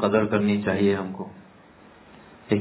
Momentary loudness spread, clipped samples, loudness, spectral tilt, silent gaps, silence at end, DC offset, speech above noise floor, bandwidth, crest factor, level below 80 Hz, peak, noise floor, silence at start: 15 LU; under 0.1%; -24 LUFS; -11 dB/octave; none; 0 s; under 0.1%; 28 dB; 4 kHz; 18 dB; -54 dBFS; -8 dBFS; -51 dBFS; 0 s